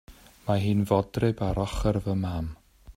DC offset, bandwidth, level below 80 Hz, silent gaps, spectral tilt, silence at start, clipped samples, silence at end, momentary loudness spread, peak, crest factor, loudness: under 0.1%; 15.5 kHz; -40 dBFS; none; -7.5 dB/octave; 0.1 s; under 0.1%; 0.05 s; 9 LU; -8 dBFS; 20 dB; -27 LUFS